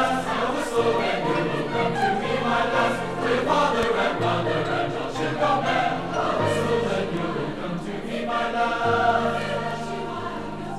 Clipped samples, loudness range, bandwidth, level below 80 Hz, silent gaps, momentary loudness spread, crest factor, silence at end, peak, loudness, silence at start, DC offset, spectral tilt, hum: under 0.1%; 2 LU; 13.5 kHz; -46 dBFS; none; 8 LU; 14 dB; 0 s; -8 dBFS; -24 LUFS; 0 s; under 0.1%; -5.5 dB/octave; none